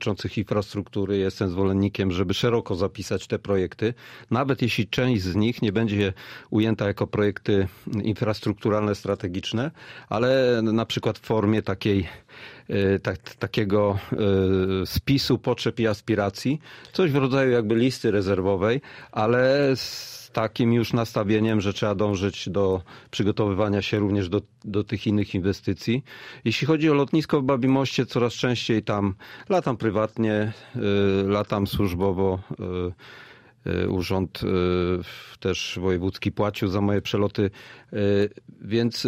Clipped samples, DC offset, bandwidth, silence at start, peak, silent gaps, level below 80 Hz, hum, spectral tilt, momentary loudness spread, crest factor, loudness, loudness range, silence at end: under 0.1%; under 0.1%; 15.5 kHz; 0 s; -8 dBFS; none; -50 dBFS; none; -6.5 dB/octave; 9 LU; 16 dB; -24 LUFS; 3 LU; 0 s